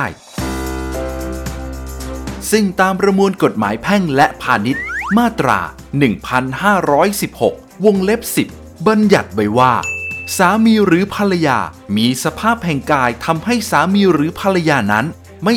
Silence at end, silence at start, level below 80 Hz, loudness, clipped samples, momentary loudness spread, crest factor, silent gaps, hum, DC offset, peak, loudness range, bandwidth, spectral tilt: 0 s; 0 s; -36 dBFS; -15 LUFS; under 0.1%; 11 LU; 14 dB; none; none; under 0.1%; 0 dBFS; 2 LU; over 20 kHz; -5 dB/octave